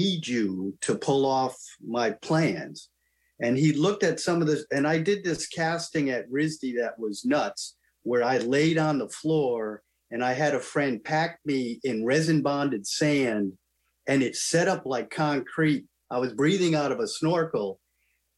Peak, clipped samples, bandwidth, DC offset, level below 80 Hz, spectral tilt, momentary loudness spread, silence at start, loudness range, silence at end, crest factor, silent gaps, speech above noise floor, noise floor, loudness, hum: -10 dBFS; under 0.1%; 12.5 kHz; under 0.1%; -68 dBFS; -5 dB/octave; 8 LU; 0 s; 2 LU; 0.65 s; 16 dB; none; 47 dB; -73 dBFS; -26 LUFS; none